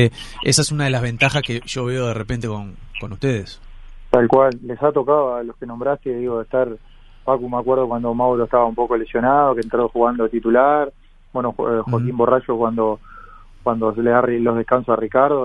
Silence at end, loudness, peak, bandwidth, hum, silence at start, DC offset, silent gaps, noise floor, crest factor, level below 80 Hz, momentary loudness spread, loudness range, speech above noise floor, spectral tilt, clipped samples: 0 s; -19 LUFS; 0 dBFS; 11.5 kHz; none; 0 s; under 0.1%; none; -41 dBFS; 18 dB; -42 dBFS; 10 LU; 4 LU; 23 dB; -5.5 dB/octave; under 0.1%